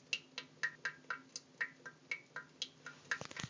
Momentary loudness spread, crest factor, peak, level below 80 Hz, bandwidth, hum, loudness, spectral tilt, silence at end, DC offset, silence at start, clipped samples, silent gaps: 10 LU; 24 dB; -22 dBFS; -80 dBFS; 7.8 kHz; none; -44 LUFS; -1.5 dB/octave; 0 s; under 0.1%; 0 s; under 0.1%; none